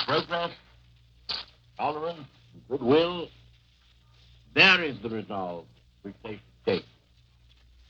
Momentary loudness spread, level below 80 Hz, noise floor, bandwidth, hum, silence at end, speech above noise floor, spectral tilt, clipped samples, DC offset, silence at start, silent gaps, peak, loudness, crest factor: 24 LU; -60 dBFS; -61 dBFS; 7.6 kHz; none; 1.05 s; 34 dB; -5 dB/octave; under 0.1%; under 0.1%; 0 s; none; -6 dBFS; -26 LUFS; 24 dB